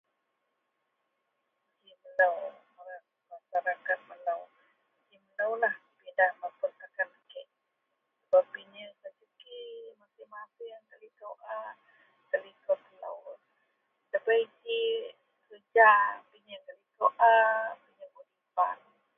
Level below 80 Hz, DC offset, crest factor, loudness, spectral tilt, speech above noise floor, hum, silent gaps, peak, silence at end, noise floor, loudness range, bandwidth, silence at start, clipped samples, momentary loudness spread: under -90 dBFS; under 0.1%; 24 dB; -29 LUFS; -4 dB/octave; 54 dB; none; none; -8 dBFS; 0.4 s; -81 dBFS; 13 LU; 3.8 kHz; 2.05 s; under 0.1%; 25 LU